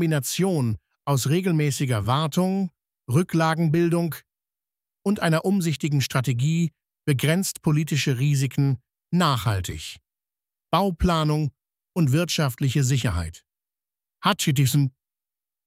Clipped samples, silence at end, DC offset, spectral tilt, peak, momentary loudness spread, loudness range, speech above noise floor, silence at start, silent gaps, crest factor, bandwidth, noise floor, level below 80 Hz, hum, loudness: under 0.1%; 0.75 s; under 0.1%; -5.5 dB/octave; -6 dBFS; 9 LU; 2 LU; over 68 dB; 0 s; none; 18 dB; 16 kHz; under -90 dBFS; -46 dBFS; none; -23 LUFS